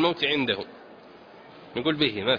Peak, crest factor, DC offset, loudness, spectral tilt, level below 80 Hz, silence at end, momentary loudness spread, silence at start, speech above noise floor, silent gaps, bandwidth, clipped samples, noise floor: -8 dBFS; 18 dB; under 0.1%; -26 LUFS; -6.5 dB/octave; -62 dBFS; 0 s; 24 LU; 0 s; 23 dB; none; 5.2 kHz; under 0.1%; -48 dBFS